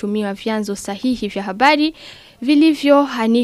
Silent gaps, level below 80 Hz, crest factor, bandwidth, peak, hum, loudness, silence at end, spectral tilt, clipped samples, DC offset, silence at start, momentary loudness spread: none; -54 dBFS; 16 dB; 14 kHz; 0 dBFS; none; -17 LUFS; 0 s; -5 dB/octave; under 0.1%; under 0.1%; 0 s; 11 LU